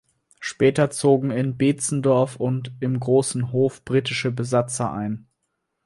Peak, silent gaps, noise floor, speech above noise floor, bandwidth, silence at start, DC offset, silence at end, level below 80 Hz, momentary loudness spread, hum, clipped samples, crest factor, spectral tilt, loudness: -4 dBFS; none; -76 dBFS; 55 dB; 11.5 kHz; 0.4 s; under 0.1%; 0.7 s; -58 dBFS; 7 LU; none; under 0.1%; 18 dB; -5.5 dB/octave; -22 LUFS